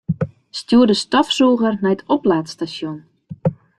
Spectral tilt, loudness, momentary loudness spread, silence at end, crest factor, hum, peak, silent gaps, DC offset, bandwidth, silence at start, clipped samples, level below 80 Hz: -5.5 dB/octave; -18 LUFS; 14 LU; 0.25 s; 16 dB; none; -2 dBFS; none; under 0.1%; 10.5 kHz; 0.1 s; under 0.1%; -54 dBFS